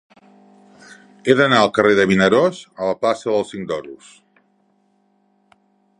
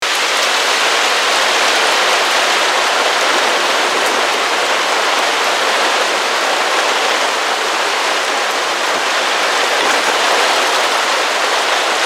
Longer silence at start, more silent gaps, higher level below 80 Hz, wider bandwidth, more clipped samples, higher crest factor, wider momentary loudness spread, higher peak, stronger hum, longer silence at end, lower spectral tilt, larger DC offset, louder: first, 1.25 s vs 0 s; neither; first, -56 dBFS vs -72 dBFS; second, 10.5 kHz vs 17 kHz; neither; first, 20 dB vs 14 dB; first, 13 LU vs 3 LU; about the same, 0 dBFS vs -2 dBFS; neither; first, 2.05 s vs 0 s; first, -5.5 dB/octave vs 1 dB/octave; neither; second, -17 LUFS vs -13 LUFS